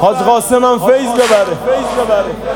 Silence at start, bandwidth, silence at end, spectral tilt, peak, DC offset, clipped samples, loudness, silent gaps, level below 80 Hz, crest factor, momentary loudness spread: 0 s; 18.5 kHz; 0 s; -4 dB/octave; 0 dBFS; under 0.1%; under 0.1%; -12 LUFS; none; -40 dBFS; 12 dB; 4 LU